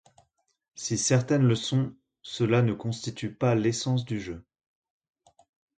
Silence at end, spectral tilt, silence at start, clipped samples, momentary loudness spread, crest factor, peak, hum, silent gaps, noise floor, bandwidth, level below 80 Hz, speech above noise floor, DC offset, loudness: 1.35 s; -5.5 dB/octave; 0.75 s; under 0.1%; 14 LU; 18 dB; -10 dBFS; none; none; -65 dBFS; 9.2 kHz; -60 dBFS; 39 dB; under 0.1%; -27 LUFS